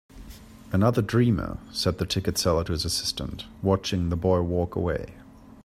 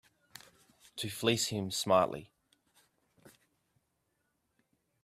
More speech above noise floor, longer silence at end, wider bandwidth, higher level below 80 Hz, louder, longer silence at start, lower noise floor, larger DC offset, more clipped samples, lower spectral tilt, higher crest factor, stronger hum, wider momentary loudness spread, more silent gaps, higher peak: second, 20 dB vs 48 dB; second, 0 s vs 1.75 s; about the same, 16 kHz vs 15.5 kHz; first, -44 dBFS vs -72 dBFS; first, -26 LUFS vs -32 LUFS; second, 0.15 s vs 0.95 s; second, -45 dBFS vs -80 dBFS; neither; neither; first, -5.5 dB/octave vs -3.5 dB/octave; second, 18 dB vs 24 dB; neither; second, 10 LU vs 25 LU; neither; first, -8 dBFS vs -14 dBFS